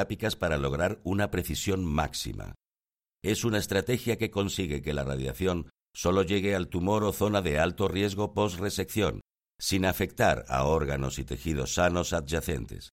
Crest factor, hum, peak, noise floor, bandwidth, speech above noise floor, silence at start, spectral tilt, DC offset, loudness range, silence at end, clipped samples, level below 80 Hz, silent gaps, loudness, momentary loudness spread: 20 dB; none; -10 dBFS; under -90 dBFS; 16.5 kHz; over 62 dB; 0 s; -5 dB/octave; under 0.1%; 3 LU; 0.05 s; under 0.1%; -44 dBFS; none; -29 LUFS; 7 LU